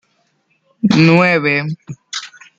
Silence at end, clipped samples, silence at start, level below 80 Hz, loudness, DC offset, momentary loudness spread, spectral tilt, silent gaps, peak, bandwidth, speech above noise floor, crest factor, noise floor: 0.3 s; under 0.1%; 0.85 s; -56 dBFS; -12 LUFS; under 0.1%; 17 LU; -6 dB/octave; none; -2 dBFS; 7.8 kHz; 49 dB; 14 dB; -62 dBFS